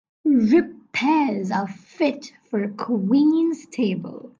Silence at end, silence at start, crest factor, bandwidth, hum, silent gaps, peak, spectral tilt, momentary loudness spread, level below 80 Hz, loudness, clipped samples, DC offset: 0.1 s; 0.25 s; 14 dB; 7.6 kHz; none; none; -6 dBFS; -6.5 dB/octave; 10 LU; -64 dBFS; -22 LUFS; under 0.1%; under 0.1%